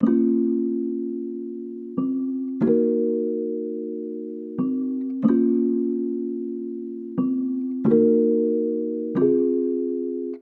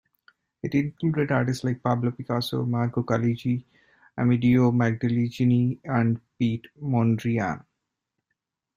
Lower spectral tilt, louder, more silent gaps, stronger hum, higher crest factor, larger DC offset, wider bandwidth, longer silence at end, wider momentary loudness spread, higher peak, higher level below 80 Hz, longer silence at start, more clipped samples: first, -12 dB/octave vs -8 dB/octave; about the same, -24 LUFS vs -25 LUFS; neither; neither; about the same, 18 dB vs 16 dB; neither; second, 3 kHz vs 14.5 kHz; second, 0 s vs 1.2 s; first, 12 LU vs 7 LU; about the same, -6 dBFS vs -8 dBFS; second, -68 dBFS vs -60 dBFS; second, 0 s vs 0.65 s; neither